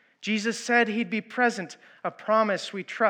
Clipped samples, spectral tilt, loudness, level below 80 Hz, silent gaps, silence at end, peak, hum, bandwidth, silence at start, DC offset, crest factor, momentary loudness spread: under 0.1%; -4 dB/octave; -26 LUFS; under -90 dBFS; none; 0 s; -8 dBFS; none; 10.5 kHz; 0.2 s; under 0.1%; 18 dB; 13 LU